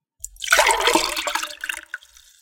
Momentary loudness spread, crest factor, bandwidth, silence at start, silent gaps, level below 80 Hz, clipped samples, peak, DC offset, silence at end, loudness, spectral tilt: 21 LU; 22 dB; 17 kHz; 0.25 s; none; -50 dBFS; under 0.1%; 0 dBFS; under 0.1%; 0.45 s; -19 LUFS; 0.5 dB/octave